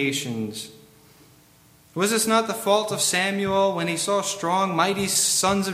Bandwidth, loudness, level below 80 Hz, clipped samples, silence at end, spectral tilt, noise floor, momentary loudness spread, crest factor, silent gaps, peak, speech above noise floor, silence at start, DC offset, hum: 16.5 kHz; -22 LUFS; -60 dBFS; under 0.1%; 0 s; -3 dB/octave; -55 dBFS; 11 LU; 18 dB; none; -6 dBFS; 32 dB; 0 s; under 0.1%; none